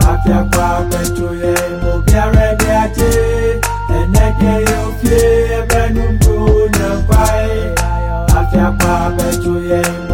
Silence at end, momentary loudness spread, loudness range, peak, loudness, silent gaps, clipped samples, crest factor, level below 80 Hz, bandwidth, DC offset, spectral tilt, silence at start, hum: 0 s; 5 LU; 1 LU; 0 dBFS; -13 LUFS; none; under 0.1%; 12 dB; -16 dBFS; 17 kHz; 1%; -6 dB/octave; 0 s; none